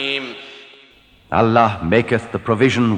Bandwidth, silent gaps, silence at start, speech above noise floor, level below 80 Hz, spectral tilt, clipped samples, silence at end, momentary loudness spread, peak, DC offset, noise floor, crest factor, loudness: 9.8 kHz; none; 0 s; 33 dB; -46 dBFS; -6.5 dB/octave; under 0.1%; 0 s; 17 LU; -2 dBFS; under 0.1%; -50 dBFS; 16 dB; -17 LUFS